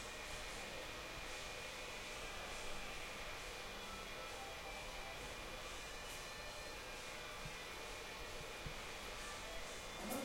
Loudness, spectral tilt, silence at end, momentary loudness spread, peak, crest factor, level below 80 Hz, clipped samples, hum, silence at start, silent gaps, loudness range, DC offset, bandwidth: -48 LUFS; -2 dB/octave; 0 s; 1 LU; -30 dBFS; 18 dB; -58 dBFS; under 0.1%; none; 0 s; none; 1 LU; under 0.1%; 16.5 kHz